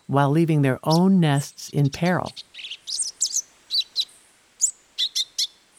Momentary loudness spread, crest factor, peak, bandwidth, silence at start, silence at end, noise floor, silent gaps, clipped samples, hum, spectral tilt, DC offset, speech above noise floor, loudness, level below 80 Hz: 10 LU; 18 dB; -6 dBFS; 16 kHz; 0.1 s; 0.35 s; -55 dBFS; none; under 0.1%; none; -4 dB/octave; under 0.1%; 34 dB; -22 LUFS; -62 dBFS